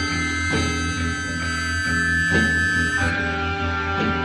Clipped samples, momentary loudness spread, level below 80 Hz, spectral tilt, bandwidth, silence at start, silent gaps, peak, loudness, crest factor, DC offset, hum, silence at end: under 0.1%; 6 LU; -36 dBFS; -4 dB/octave; 12.5 kHz; 0 s; none; -8 dBFS; -21 LUFS; 14 dB; under 0.1%; none; 0 s